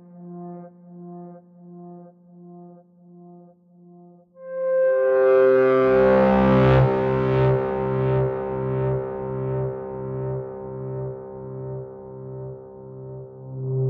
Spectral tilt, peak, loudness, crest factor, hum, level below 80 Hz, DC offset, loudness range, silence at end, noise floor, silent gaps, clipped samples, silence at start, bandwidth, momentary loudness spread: -10 dB/octave; -8 dBFS; -21 LUFS; 16 dB; none; -44 dBFS; under 0.1%; 16 LU; 0 s; -51 dBFS; none; under 0.1%; 0.1 s; 5.2 kHz; 24 LU